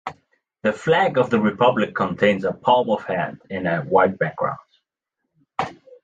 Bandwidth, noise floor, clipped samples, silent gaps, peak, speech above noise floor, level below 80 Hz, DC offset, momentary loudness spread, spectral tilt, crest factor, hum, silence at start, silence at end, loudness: 8 kHz; -80 dBFS; under 0.1%; none; -2 dBFS; 60 dB; -58 dBFS; under 0.1%; 11 LU; -6.5 dB/octave; 18 dB; none; 0.05 s; 0.3 s; -21 LUFS